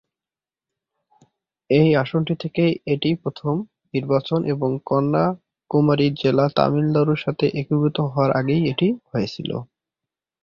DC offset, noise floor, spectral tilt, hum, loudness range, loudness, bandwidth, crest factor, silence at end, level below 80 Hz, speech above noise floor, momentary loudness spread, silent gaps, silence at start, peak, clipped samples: under 0.1%; under -90 dBFS; -9 dB/octave; none; 3 LU; -21 LUFS; 6.8 kHz; 20 dB; 0.8 s; -56 dBFS; over 70 dB; 8 LU; none; 1.7 s; -2 dBFS; under 0.1%